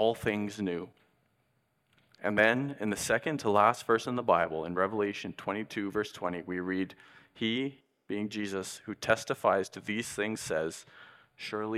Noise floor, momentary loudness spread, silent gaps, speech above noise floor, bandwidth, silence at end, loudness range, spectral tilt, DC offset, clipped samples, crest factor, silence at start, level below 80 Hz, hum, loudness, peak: -75 dBFS; 12 LU; none; 43 dB; 16 kHz; 0 s; 7 LU; -4.5 dB/octave; under 0.1%; under 0.1%; 24 dB; 0 s; -66 dBFS; none; -31 LUFS; -8 dBFS